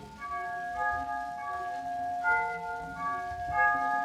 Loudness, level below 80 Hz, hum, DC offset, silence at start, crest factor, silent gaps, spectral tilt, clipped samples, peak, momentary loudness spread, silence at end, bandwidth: -32 LUFS; -56 dBFS; none; under 0.1%; 0 s; 16 dB; none; -4.5 dB/octave; under 0.1%; -16 dBFS; 10 LU; 0 s; 14 kHz